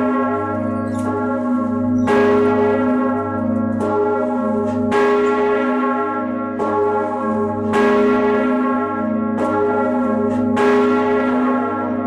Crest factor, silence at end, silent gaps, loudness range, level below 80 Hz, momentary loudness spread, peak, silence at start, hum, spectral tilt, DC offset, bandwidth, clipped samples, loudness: 14 dB; 0 s; none; 1 LU; -54 dBFS; 6 LU; -4 dBFS; 0 s; none; -7.5 dB/octave; under 0.1%; 10 kHz; under 0.1%; -18 LUFS